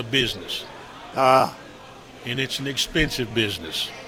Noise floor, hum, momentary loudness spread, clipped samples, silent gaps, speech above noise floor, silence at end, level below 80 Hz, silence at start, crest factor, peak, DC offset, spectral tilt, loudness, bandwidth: -43 dBFS; none; 22 LU; under 0.1%; none; 20 dB; 0 s; -44 dBFS; 0 s; 22 dB; -4 dBFS; under 0.1%; -3.5 dB/octave; -23 LUFS; over 20 kHz